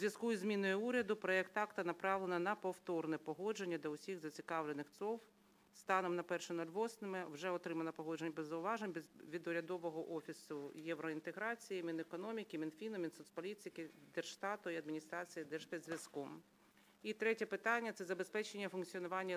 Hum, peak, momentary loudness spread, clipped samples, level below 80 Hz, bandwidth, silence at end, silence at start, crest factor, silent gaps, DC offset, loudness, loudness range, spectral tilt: none; -22 dBFS; 10 LU; under 0.1%; under -90 dBFS; 16 kHz; 0 s; 0 s; 22 dB; none; under 0.1%; -43 LUFS; 6 LU; -5 dB/octave